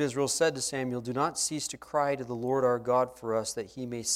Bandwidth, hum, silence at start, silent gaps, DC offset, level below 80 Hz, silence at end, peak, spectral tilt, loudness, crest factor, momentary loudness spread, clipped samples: 16 kHz; none; 0 s; none; under 0.1%; -66 dBFS; 0 s; -14 dBFS; -3.5 dB/octave; -30 LUFS; 16 dB; 8 LU; under 0.1%